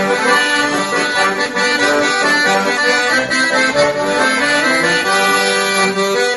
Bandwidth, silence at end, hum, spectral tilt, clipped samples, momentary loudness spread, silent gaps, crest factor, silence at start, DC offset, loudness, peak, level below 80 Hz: 12 kHz; 0 s; none; -2 dB/octave; under 0.1%; 2 LU; none; 14 dB; 0 s; under 0.1%; -13 LUFS; 0 dBFS; -52 dBFS